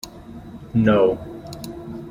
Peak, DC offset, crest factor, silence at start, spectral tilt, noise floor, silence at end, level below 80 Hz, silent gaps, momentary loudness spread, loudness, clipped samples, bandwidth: -4 dBFS; under 0.1%; 18 dB; 0.05 s; -7 dB/octave; -39 dBFS; 0 s; -46 dBFS; none; 22 LU; -19 LUFS; under 0.1%; 16.5 kHz